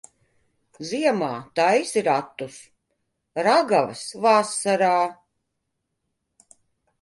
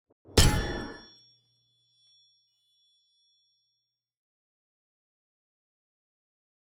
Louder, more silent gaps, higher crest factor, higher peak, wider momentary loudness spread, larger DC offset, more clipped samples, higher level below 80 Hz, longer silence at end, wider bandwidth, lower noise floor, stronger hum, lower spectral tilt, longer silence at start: first, -22 LUFS vs -26 LUFS; neither; second, 18 dB vs 26 dB; about the same, -6 dBFS vs -8 dBFS; second, 15 LU vs 20 LU; neither; neither; second, -72 dBFS vs -40 dBFS; second, 1.9 s vs 5.75 s; second, 11.5 kHz vs over 20 kHz; second, -78 dBFS vs -82 dBFS; neither; about the same, -3.5 dB/octave vs -4 dB/octave; first, 0.8 s vs 0.35 s